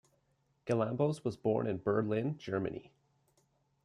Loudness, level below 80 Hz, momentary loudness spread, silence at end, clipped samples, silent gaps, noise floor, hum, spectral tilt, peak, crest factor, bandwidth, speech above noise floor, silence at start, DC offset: -34 LUFS; -72 dBFS; 7 LU; 1 s; under 0.1%; none; -76 dBFS; none; -8 dB/octave; -18 dBFS; 18 dB; 11.5 kHz; 42 dB; 0.65 s; under 0.1%